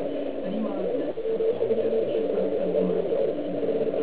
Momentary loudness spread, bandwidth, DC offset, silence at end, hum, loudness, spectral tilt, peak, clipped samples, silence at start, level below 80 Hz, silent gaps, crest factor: 5 LU; 4 kHz; 1%; 0 s; none; -26 LUFS; -11 dB/octave; -12 dBFS; under 0.1%; 0 s; -60 dBFS; none; 14 dB